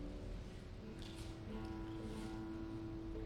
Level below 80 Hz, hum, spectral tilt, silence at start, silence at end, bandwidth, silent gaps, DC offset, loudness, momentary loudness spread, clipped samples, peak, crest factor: -52 dBFS; none; -6.5 dB/octave; 0 s; 0 s; 14 kHz; none; under 0.1%; -49 LUFS; 4 LU; under 0.1%; -36 dBFS; 12 dB